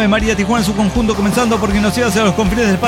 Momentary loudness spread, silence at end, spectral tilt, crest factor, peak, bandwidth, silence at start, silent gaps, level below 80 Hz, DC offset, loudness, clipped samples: 2 LU; 0 s; -5 dB/octave; 12 dB; -2 dBFS; 16.5 kHz; 0 s; none; -28 dBFS; under 0.1%; -14 LUFS; under 0.1%